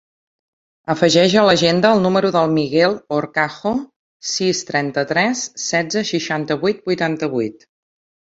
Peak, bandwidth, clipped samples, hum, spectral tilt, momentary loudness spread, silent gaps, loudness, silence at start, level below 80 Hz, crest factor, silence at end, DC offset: 0 dBFS; 8 kHz; under 0.1%; none; -4.5 dB/octave; 10 LU; 3.96-4.20 s; -17 LUFS; 0.9 s; -58 dBFS; 18 dB; 0.85 s; under 0.1%